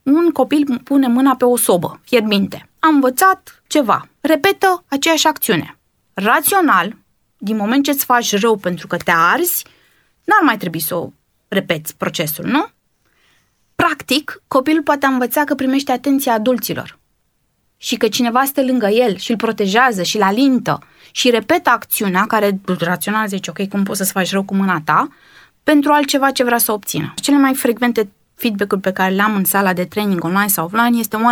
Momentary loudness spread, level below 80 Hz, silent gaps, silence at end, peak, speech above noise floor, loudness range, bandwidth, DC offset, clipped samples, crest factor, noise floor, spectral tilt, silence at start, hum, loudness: 9 LU; -60 dBFS; none; 0 s; 0 dBFS; 49 dB; 3 LU; over 20 kHz; under 0.1%; under 0.1%; 16 dB; -64 dBFS; -4 dB/octave; 0.05 s; none; -15 LUFS